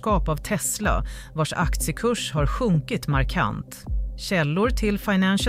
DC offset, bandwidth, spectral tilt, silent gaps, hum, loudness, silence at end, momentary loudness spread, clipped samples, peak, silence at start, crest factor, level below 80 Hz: under 0.1%; 16 kHz; -5 dB/octave; none; none; -24 LUFS; 0 s; 8 LU; under 0.1%; -8 dBFS; 0 s; 14 dB; -30 dBFS